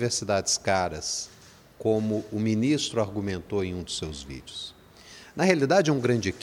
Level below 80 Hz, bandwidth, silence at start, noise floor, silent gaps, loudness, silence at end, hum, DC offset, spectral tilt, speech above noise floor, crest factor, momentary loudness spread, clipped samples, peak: -54 dBFS; 16 kHz; 0 s; -49 dBFS; none; -26 LUFS; 0 s; none; under 0.1%; -4.5 dB/octave; 23 dB; 20 dB; 16 LU; under 0.1%; -6 dBFS